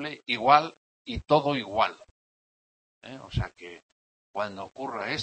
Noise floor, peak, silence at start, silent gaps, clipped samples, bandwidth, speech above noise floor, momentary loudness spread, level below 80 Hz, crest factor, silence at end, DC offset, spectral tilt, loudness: under -90 dBFS; -4 dBFS; 0 s; 0.77-1.05 s, 2.11-3.01 s, 3.83-4.34 s; under 0.1%; 8.6 kHz; over 63 dB; 24 LU; -50 dBFS; 24 dB; 0 s; under 0.1%; -5.5 dB/octave; -27 LUFS